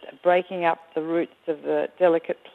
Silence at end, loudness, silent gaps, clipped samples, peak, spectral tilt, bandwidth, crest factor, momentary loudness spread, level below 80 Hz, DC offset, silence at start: 0.05 s; -24 LUFS; none; under 0.1%; -8 dBFS; -7.5 dB/octave; 4.2 kHz; 18 dB; 8 LU; -78 dBFS; under 0.1%; 0 s